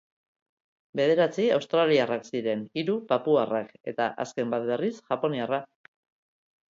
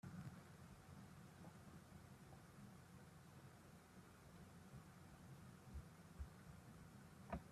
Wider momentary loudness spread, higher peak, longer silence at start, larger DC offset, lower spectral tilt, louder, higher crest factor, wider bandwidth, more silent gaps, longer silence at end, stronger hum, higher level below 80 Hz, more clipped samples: first, 8 LU vs 5 LU; first, -10 dBFS vs -36 dBFS; first, 0.95 s vs 0.05 s; neither; about the same, -6 dB/octave vs -6 dB/octave; first, -27 LUFS vs -62 LUFS; second, 18 dB vs 26 dB; second, 7.6 kHz vs 14.5 kHz; first, 3.80-3.84 s vs none; first, 1.05 s vs 0 s; neither; second, -76 dBFS vs -68 dBFS; neither